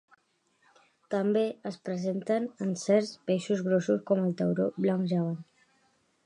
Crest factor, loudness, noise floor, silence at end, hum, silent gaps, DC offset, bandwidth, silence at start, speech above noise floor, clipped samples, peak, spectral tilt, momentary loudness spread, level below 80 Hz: 18 dB; -29 LUFS; -72 dBFS; 0.85 s; none; none; under 0.1%; 10.5 kHz; 1.1 s; 43 dB; under 0.1%; -12 dBFS; -7 dB/octave; 7 LU; -78 dBFS